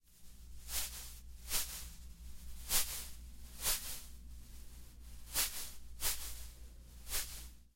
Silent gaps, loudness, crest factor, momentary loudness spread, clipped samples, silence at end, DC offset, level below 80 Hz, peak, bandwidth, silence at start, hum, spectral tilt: none; -39 LUFS; 24 dB; 20 LU; under 0.1%; 0.05 s; under 0.1%; -50 dBFS; -18 dBFS; 16.5 kHz; 0.1 s; none; -0.5 dB/octave